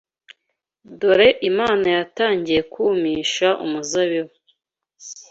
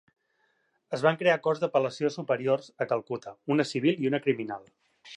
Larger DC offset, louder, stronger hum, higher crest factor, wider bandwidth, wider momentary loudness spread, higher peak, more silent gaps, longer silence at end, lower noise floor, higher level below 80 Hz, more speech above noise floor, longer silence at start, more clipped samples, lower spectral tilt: neither; first, -19 LUFS vs -28 LUFS; neither; about the same, 18 dB vs 22 dB; second, 8 kHz vs 10.5 kHz; about the same, 10 LU vs 11 LU; first, -2 dBFS vs -8 dBFS; neither; about the same, 0.1 s vs 0 s; first, -76 dBFS vs -72 dBFS; first, -56 dBFS vs -80 dBFS; first, 58 dB vs 45 dB; about the same, 0.9 s vs 0.9 s; neither; second, -3.5 dB/octave vs -6 dB/octave